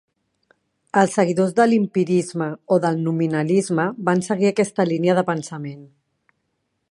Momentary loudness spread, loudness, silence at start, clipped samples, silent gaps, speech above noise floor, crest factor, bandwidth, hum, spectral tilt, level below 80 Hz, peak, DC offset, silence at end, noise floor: 9 LU; -20 LUFS; 0.95 s; under 0.1%; none; 54 dB; 20 dB; 11.5 kHz; none; -6.5 dB/octave; -68 dBFS; -2 dBFS; under 0.1%; 1.05 s; -73 dBFS